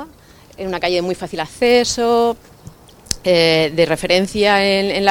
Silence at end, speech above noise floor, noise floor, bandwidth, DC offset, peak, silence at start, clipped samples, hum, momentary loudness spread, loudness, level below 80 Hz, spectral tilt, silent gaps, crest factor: 0 s; 29 dB; -44 dBFS; 17 kHz; under 0.1%; 0 dBFS; 0 s; under 0.1%; none; 12 LU; -16 LUFS; -44 dBFS; -4 dB/octave; none; 16 dB